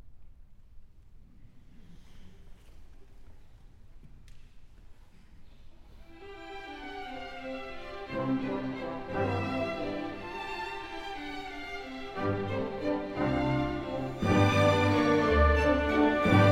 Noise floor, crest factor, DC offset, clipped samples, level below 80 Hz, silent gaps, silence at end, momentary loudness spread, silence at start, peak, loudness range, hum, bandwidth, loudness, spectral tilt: -52 dBFS; 20 dB; under 0.1%; under 0.1%; -42 dBFS; none; 0 s; 17 LU; 0.05 s; -10 dBFS; 18 LU; none; 14 kHz; -30 LUFS; -7 dB/octave